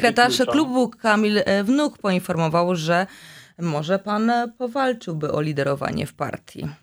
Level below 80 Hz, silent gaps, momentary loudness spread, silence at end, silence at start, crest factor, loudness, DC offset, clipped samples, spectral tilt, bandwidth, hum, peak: -58 dBFS; none; 10 LU; 0.05 s; 0 s; 18 dB; -22 LUFS; under 0.1%; under 0.1%; -5.5 dB/octave; over 20 kHz; none; -4 dBFS